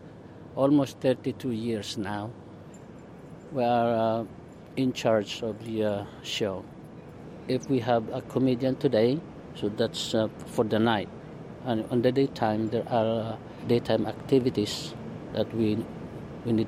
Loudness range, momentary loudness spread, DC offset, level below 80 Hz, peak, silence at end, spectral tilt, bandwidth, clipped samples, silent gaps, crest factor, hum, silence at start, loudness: 3 LU; 20 LU; under 0.1%; -58 dBFS; -10 dBFS; 0 s; -6.5 dB/octave; 15 kHz; under 0.1%; none; 18 dB; none; 0 s; -28 LUFS